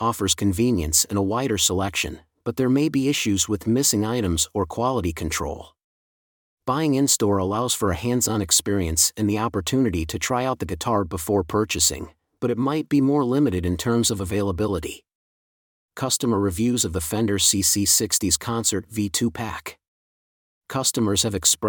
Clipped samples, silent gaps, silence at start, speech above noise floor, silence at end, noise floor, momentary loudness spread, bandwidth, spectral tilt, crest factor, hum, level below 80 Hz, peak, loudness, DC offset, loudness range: under 0.1%; 5.84-6.57 s, 15.15-15.89 s, 19.88-20.61 s; 0 s; over 68 dB; 0 s; under -90 dBFS; 8 LU; 19 kHz; -3.5 dB/octave; 20 dB; none; -46 dBFS; -2 dBFS; -22 LUFS; under 0.1%; 4 LU